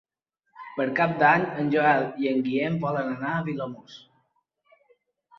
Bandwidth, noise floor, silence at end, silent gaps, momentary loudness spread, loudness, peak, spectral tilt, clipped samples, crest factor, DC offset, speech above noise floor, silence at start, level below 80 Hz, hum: 6.4 kHz; -76 dBFS; 1.4 s; none; 15 LU; -24 LUFS; -6 dBFS; -8 dB/octave; under 0.1%; 20 dB; under 0.1%; 51 dB; 0.55 s; -68 dBFS; none